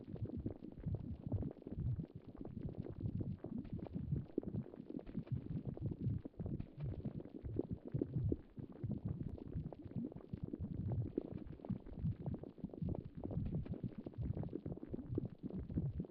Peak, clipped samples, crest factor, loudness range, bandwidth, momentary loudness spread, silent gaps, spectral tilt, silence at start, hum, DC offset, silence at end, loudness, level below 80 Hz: -24 dBFS; under 0.1%; 20 dB; 1 LU; 4.7 kHz; 6 LU; none; -11.5 dB/octave; 0 s; none; under 0.1%; 0 s; -46 LUFS; -56 dBFS